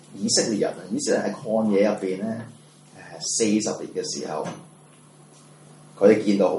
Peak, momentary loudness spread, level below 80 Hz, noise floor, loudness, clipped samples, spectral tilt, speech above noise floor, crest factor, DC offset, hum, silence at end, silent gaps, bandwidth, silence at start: -4 dBFS; 13 LU; -72 dBFS; -51 dBFS; -23 LUFS; under 0.1%; -4 dB/octave; 28 dB; 20 dB; under 0.1%; none; 0 s; none; 11.5 kHz; 0.1 s